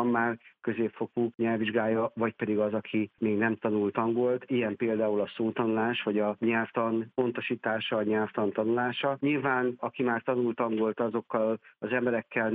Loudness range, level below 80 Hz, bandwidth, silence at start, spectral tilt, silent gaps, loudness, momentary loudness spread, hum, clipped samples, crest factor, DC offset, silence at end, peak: 1 LU; -74 dBFS; 4 kHz; 0 s; -9.5 dB/octave; none; -29 LUFS; 4 LU; none; under 0.1%; 16 dB; under 0.1%; 0 s; -12 dBFS